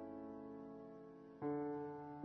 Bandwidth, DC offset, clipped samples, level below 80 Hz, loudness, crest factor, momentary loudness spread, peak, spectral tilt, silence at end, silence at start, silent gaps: 5.6 kHz; under 0.1%; under 0.1%; -82 dBFS; -49 LUFS; 16 dB; 13 LU; -32 dBFS; -8.5 dB/octave; 0 s; 0 s; none